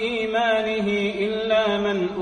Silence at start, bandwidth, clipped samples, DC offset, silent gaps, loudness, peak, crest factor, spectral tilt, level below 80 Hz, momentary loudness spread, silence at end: 0 s; 9.6 kHz; under 0.1%; under 0.1%; none; -22 LUFS; -8 dBFS; 14 dB; -5.5 dB/octave; -54 dBFS; 3 LU; 0 s